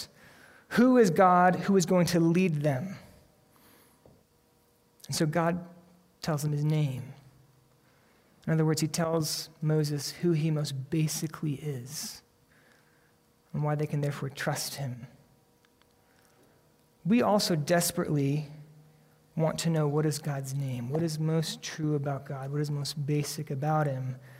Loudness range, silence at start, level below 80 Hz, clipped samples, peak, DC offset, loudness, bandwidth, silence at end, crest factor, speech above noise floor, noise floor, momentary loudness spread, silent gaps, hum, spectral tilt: 9 LU; 0 s; -66 dBFS; under 0.1%; -10 dBFS; under 0.1%; -29 LUFS; 16 kHz; 0 s; 20 dB; 38 dB; -66 dBFS; 13 LU; none; none; -5.5 dB/octave